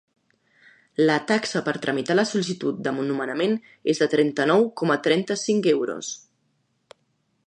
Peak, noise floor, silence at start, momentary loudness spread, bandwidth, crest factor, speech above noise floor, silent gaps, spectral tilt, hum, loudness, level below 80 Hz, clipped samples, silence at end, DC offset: -6 dBFS; -70 dBFS; 1 s; 7 LU; 10 kHz; 18 dB; 48 dB; none; -4.5 dB/octave; none; -23 LUFS; -74 dBFS; under 0.1%; 1.3 s; under 0.1%